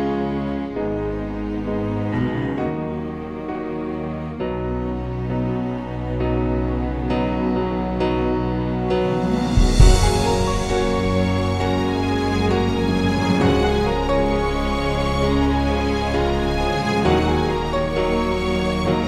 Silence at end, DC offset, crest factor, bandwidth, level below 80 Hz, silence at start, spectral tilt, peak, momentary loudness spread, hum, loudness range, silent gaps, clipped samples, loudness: 0 s; 0.4%; 18 dB; 13 kHz; -26 dBFS; 0 s; -6.5 dB/octave; -2 dBFS; 8 LU; none; 6 LU; none; under 0.1%; -21 LUFS